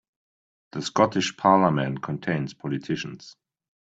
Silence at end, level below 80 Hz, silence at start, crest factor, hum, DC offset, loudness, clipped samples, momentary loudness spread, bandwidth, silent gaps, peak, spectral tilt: 0.65 s; -64 dBFS; 0.75 s; 22 dB; none; under 0.1%; -24 LUFS; under 0.1%; 15 LU; 8 kHz; none; -4 dBFS; -5.5 dB/octave